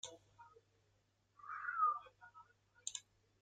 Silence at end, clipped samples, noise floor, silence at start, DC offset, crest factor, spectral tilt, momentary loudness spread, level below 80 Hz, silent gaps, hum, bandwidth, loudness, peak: 0.4 s; under 0.1%; -79 dBFS; 0.05 s; under 0.1%; 22 dB; 1 dB/octave; 25 LU; -86 dBFS; none; none; 9.6 kHz; -42 LUFS; -24 dBFS